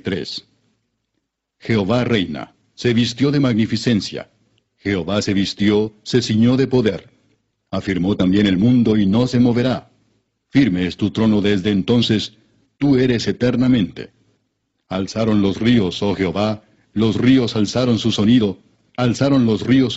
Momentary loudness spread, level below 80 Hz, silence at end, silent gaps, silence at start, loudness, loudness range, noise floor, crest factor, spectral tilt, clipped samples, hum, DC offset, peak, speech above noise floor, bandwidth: 13 LU; -46 dBFS; 0 s; none; 0.05 s; -17 LUFS; 3 LU; -74 dBFS; 16 dB; -6 dB/octave; under 0.1%; none; under 0.1%; -2 dBFS; 58 dB; 8 kHz